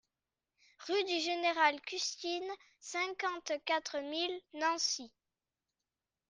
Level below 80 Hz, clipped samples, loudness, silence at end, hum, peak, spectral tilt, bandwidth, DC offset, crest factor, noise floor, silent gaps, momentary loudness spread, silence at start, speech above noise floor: -84 dBFS; under 0.1%; -35 LUFS; 1.2 s; none; -14 dBFS; 0.5 dB/octave; 10.5 kHz; under 0.1%; 22 dB; under -90 dBFS; none; 10 LU; 0.8 s; over 54 dB